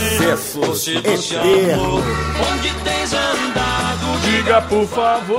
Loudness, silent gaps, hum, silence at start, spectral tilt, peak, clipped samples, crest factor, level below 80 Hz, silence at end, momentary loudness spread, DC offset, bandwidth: -17 LUFS; none; none; 0 s; -4 dB/octave; 0 dBFS; under 0.1%; 16 dB; -32 dBFS; 0 s; 5 LU; under 0.1%; 16.5 kHz